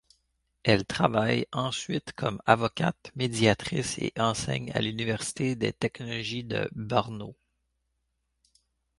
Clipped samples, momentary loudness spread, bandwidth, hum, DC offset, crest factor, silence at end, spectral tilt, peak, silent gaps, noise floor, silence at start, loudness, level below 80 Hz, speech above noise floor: under 0.1%; 8 LU; 11.5 kHz; none; under 0.1%; 26 dB; 1.65 s; -5 dB/octave; -4 dBFS; none; -78 dBFS; 0.65 s; -28 LUFS; -56 dBFS; 50 dB